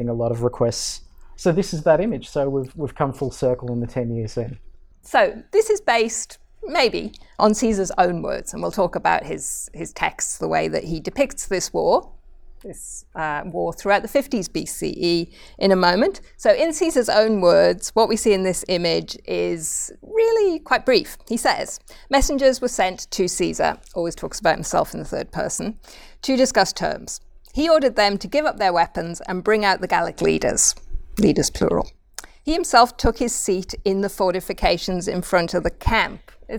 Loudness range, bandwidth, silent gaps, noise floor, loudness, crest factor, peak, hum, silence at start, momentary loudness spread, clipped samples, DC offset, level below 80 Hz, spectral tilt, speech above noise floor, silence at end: 5 LU; 20 kHz; none; -41 dBFS; -21 LUFS; 20 dB; -2 dBFS; none; 0 s; 11 LU; under 0.1%; under 0.1%; -38 dBFS; -4 dB/octave; 21 dB; 0 s